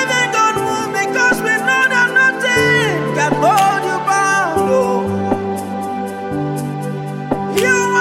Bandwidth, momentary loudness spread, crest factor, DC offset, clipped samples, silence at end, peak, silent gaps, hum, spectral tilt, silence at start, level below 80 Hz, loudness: 16.5 kHz; 10 LU; 14 dB; under 0.1%; under 0.1%; 0 s; 0 dBFS; none; none; -4 dB/octave; 0 s; -50 dBFS; -15 LUFS